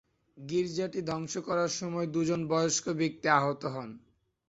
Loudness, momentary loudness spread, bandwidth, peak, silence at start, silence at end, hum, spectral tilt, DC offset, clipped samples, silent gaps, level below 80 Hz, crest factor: -31 LUFS; 10 LU; 8.2 kHz; -10 dBFS; 0.35 s; 0.5 s; none; -4.5 dB/octave; under 0.1%; under 0.1%; none; -68 dBFS; 22 dB